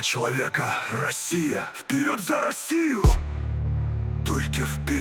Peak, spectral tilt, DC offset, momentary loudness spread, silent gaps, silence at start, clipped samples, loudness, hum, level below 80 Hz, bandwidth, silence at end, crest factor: -8 dBFS; -4.5 dB/octave; under 0.1%; 6 LU; none; 0 s; under 0.1%; -26 LUFS; none; -32 dBFS; 19 kHz; 0 s; 18 dB